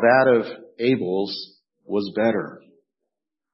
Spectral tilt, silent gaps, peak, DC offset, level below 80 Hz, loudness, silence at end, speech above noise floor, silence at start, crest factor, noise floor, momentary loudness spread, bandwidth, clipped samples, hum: -10 dB/octave; none; -4 dBFS; under 0.1%; -70 dBFS; -22 LUFS; 0.95 s; 64 dB; 0 s; 18 dB; -84 dBFS; 16 LU; 5.8 kHz; under 0.1%; none